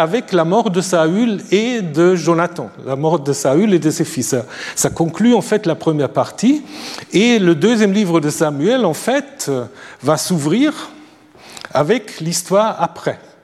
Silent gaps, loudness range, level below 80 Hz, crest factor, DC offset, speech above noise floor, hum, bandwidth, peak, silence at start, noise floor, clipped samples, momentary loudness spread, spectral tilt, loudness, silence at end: none; 3 LU; -56 dBFS; 14 dB; under 0.1%; 27 dB; none; 15 kHz; -2 dBFS; 0 s; -42 dBFS; under 0.1%; 9 LU; -5 dB/octave; -16 LUFS; 0.25 s